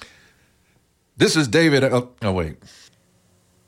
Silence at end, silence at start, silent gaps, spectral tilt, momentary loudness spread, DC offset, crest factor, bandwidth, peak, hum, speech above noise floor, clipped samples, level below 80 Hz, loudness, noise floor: 1.15 s; 0 s; none; -5 dB/octave; 9 LU; under 0.1%; 18 dB; 16.5 kHz; -4 dBFS; none; 43 dB; under 0.1%; -52 dBFS; -19 LUFS; -62 dBFS